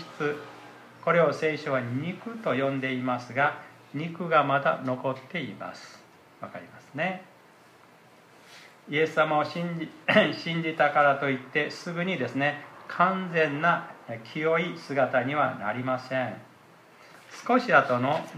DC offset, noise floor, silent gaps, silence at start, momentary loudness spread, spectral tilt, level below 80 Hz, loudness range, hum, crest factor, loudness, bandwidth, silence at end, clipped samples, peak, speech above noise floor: under 0.1%; -55 dBFS; none; 0 s; 18 LU; -6 dB/octave; -78 dBFS; 8 LU; none; 22 dB; -27 LUFS; 14 kHz; 0 s; under 0.1%; -6 dBFS; 28 dB